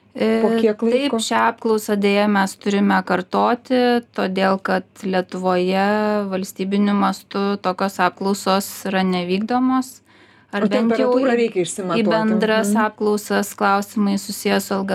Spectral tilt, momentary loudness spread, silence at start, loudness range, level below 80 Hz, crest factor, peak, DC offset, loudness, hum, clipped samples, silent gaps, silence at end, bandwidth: -5 dB/octave; 6 LU; 0.15 s; 2 LU; -64 dBFS; 18 dB; -2 dBFS; under 0.1%; -19 LUFS; none; under 0.1%; none; 0 s; 15.5 kHz